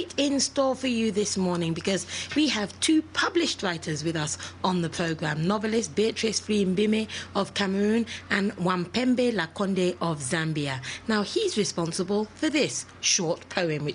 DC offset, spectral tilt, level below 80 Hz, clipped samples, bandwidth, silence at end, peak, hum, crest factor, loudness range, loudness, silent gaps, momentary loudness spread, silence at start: under 0.1%; -4 dB/octave; -60 dBFS; under 0.1%; 10.5 kHz; 0 s; -8 dBFS; none; 20 dB; 2 LU; -26 LUFS; none; 5 LU; 0 s